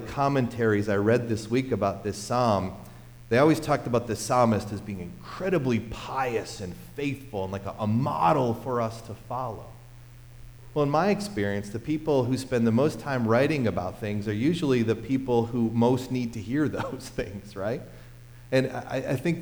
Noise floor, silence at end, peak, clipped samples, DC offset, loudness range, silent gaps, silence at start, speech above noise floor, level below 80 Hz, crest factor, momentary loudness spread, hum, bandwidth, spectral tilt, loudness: -47 dBFS; 0 s; -10 dBFS; under 0.1%; under 0.1%; 4 LU; none; 0 s; 21 dB; -50 dBFS; 18 dB; 12 LU; none; over 20 kHz; -6.5 dB/octave; -27 LUFS